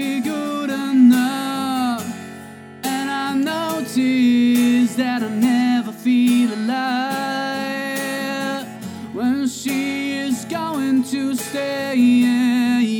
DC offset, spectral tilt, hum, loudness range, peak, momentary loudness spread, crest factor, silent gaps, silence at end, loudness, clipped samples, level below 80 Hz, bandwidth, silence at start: under 0.1%; -4.5 dB/octave; none; 5 LU; -4 dBFS; 10 LU; 14 dB; none; 0 s; -19 LUFS; under 0.1%; -72 dBFS; 19 kHz; 0 s